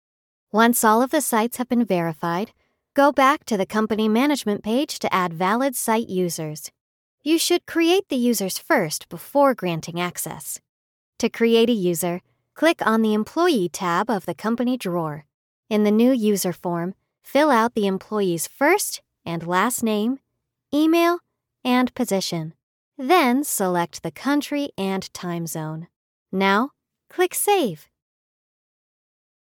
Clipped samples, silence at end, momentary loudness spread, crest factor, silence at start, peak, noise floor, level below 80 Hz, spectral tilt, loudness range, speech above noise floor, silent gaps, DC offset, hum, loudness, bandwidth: under 0.1%; 1.75 s; 12 LU; 18 dB; 0.55 s; -4 dBFS; -60 dBFS; -66 dBFS; -4.5 dB/octave; 3 LU; 39 dB; 6.81-7.18 s, 10.69-11.13 s, 15.34-15.63 s, 22.63-22.92 s, 25.96-26.26 s; under 0.1%; none; -21 LUFS; 19 kHz